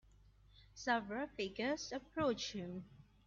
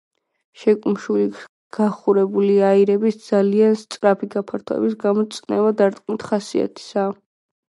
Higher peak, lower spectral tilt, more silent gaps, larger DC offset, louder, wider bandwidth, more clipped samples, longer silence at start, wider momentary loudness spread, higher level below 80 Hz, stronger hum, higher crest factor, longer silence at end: second, -22 dBFS vs -2 dBFS; second, -3 dB/octave vs -7 dB/octave; second, none vs 1.49-1.70 s; neither; second, -41 LUFS vs -19 LUFS; second, 7.4 kHz vs 11.5 kHz; neither; about the same, 0.55 s vs 0.6 s; first, 13 LU vs 10 LU; about the same, -68 dBFS vs -68 dBFS; neither; about the same, 20 dB vs 16 dB; second, 0.25 s vs 0.6 s